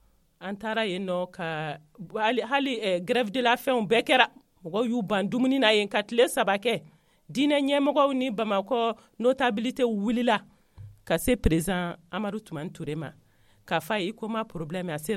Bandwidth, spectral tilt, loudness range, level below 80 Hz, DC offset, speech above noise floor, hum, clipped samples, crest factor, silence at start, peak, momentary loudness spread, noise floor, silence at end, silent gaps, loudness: 16 kHz; -5 dB/octave; 6 LU; -46 dBFS; under 0.1%; 22 dB; none; under 0.1%; 24 dB; 0.4 s; -2 dBFS; 12 LU; -48 dBFS; 0 s; none; -26 LUFS